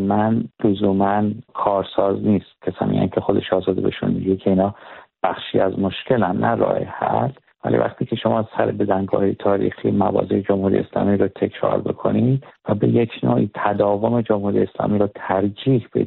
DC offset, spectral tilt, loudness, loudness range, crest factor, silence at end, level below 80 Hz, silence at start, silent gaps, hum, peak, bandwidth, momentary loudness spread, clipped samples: under 0.1%; -6.5 dB/octave; -20 LUFS; 1 LU; 16 dB; 0 s; -54 dBFS; 0 s; none; none; -2 dBFS; 4.2 kHz; 4 LU; under 0.1%